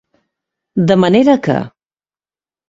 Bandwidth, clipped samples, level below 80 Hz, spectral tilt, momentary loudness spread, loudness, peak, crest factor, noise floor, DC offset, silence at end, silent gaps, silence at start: 7.8 kHz; under 0.1%; -52 dBFS; -7.5 dB/octave; 12 LU; -13 LUFS; 0 dBFS; 16 dB; under -90 dBFS; under 0.1%; 1 s; none; 0.75 s